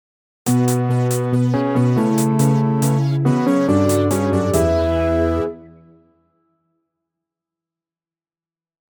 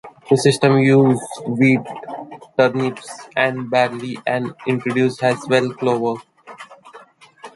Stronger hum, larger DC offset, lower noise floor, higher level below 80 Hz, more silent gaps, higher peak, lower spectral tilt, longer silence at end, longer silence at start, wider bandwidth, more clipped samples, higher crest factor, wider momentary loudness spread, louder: neither; neither; first, under -90 dBFS vs -45 dBFS; first, -38 dBFS vs -62 dBFS; neither; about the same, -4 dBFS vs -2 dBFS; about the same, -7 dB/octave vs -6 dB/octave; first, 3.3 s vs 0.05 s; first, 0.45 s vs 0.05 s; first, 19.5 kHz vs 11.5 kHz; neither; about the same, 14 dB vs 18 dB; second, 3 LU vs 18 LU; about the same, -17 LUFS vs -18 LUFS